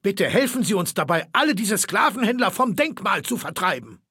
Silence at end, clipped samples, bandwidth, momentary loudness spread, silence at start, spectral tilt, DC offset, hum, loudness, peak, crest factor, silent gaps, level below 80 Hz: 0.15 s; under 0.1%; 17 kHz; 4 LU; 0.05 s; -3.5 dB/octave; under 0.1%; none; -21 LUFS; -4 dBFS; 18 dB; none; -66 dBFS